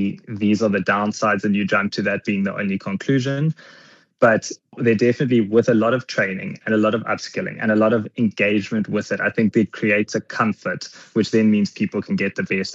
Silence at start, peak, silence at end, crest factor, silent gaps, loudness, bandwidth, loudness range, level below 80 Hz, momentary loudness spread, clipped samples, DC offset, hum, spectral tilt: 0 s; -4 dBFS; 0 s; 16 dB; none; -20 LUFS; 7.8 kHz; 2 LU; -68 dBFS; 8 LU; under 0.1%; under 0.1%; none; -6 dB/octave